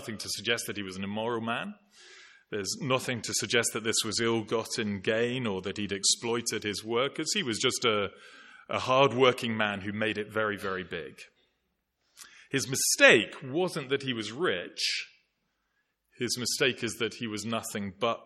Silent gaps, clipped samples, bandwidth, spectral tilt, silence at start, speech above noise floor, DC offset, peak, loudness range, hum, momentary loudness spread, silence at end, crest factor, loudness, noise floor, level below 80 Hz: none; under 0.1%; 16 kHz; -3 dB/octave; 0 s; 49 dB; under 0.1%; -4 dBFS; 6 LU; none; 11 LU; 0 s; 26 dB; -29 LUFS; -79 dBFS; -72 dBFS